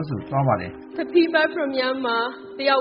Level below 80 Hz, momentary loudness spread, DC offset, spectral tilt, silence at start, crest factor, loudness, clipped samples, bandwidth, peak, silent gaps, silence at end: -58 dBFS; 9 LU; under 0.1%; -4 dB/octave; 0 s; 18 dB; -22 LUFS; under 0.1%; 5.4 kHz; -4 dBFS; none; 0 s